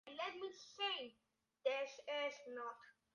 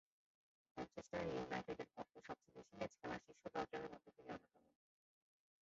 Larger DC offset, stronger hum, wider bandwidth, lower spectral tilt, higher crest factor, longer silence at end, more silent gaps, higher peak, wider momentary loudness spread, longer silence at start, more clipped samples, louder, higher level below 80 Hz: neither; neither; first, 9.8 kHz vs 7.6 kHz; second, -1 dB/octave vs -4.5 dB/octave; about the same, 20 dB vs 20 dB; second, 0.25 s vs 1.2 s; neither; first, -26 dBFS vs -32 dBFS; about the same, 10 LU vs 10 LU; second, 0.05 s vs 0.75 s; neither; first, -45 LUFS vs -51 LUFS; second, under -90 dBFS vs -76 dBFS